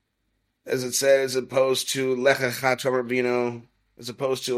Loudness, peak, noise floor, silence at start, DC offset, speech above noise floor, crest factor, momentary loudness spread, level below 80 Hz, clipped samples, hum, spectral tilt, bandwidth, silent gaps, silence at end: -23 LUFS; -6 dBFS; -74 dBFS; 0.65 s; under 0.1%; 50 dB; 18 dB; 10 LU; -68 dBFS; under 0.1%; none; -3.5 dB/octave; 16 kHz; none; 0 s